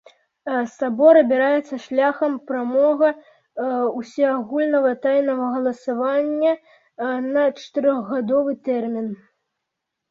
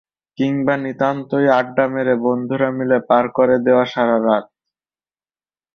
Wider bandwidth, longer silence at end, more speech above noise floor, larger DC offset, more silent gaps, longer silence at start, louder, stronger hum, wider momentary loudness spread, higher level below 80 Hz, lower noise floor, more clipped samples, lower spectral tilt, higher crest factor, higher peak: about the same, 7.2 kHz vs 6.6 kHz; second, 0.95 s vs 1.3 s; second, 61 dB vs over 74 dB; neither; neither; about the same, 0.45 s vs 0.4 s; second, -20 LUFS vs -17 LUFS; neither; first, 10 LU vs 5 LU; second, -70 dBFS vs -60 dBFS; second, -81 dBFS vs under -90 dBFS; neither; second, -6 dB/octave vs -8 dB/octave; about the same, 18 dB vs 16 dB; about the same, -2 dBFS vs -2 dBFS